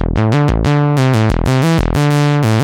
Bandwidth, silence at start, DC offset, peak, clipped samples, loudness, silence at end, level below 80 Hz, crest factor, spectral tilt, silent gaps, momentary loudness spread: 16 kHz; 0 s; under 0.1%; -2 dBFS; under 0.1%; -13 LUFS; 0 s; -22 dBFS; 10 dB; -7 dB/octave; none; 1 LU